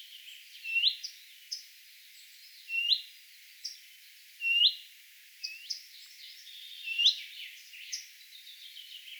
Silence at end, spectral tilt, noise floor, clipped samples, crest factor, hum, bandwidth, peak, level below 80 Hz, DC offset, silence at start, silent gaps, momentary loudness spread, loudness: 0 s; 11.5 dB/octave; -55 dBFS; under 0.1%; 24 dB; none; over 20 kHz; -12 dBFS; under -90 dBFS; under 0.1%; 0 s; none; 26 LU; -30 LUFS